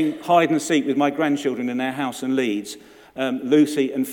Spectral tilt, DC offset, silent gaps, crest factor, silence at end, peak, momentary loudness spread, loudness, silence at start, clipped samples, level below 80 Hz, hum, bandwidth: -5 dB/octave; under 0.1%; none; 16 dB; 0 s; -4 dBFS; 10 LU; -21 LUFS; 0 s; under 0.1%; -68 dBFS; none; 18 kHz